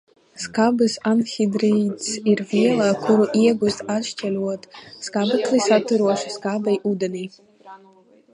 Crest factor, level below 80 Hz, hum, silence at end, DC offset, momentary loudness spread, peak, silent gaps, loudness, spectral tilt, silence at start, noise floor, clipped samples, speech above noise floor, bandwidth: 16 dB; -66 dBFS; none; 0.6 s; under 0.1%; 10 LU; -4 dBFS; none; -20 LUFS; -5 dB/octave; 0.35 s; -52 dBFS; under 0.1%; 32 dB; 11 kHz